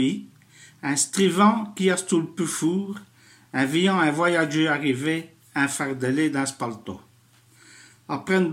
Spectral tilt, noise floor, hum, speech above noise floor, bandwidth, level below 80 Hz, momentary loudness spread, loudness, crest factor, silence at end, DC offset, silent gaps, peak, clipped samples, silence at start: -4.5 dB/octave; -57 dBFS; none; 34 dB; 16 kHz; -72 dBFS; 13 LU; -23 LUFS; 18 dB; 0 s; under 0.1%; none; -6 dBFS; under 0.1%; 0 s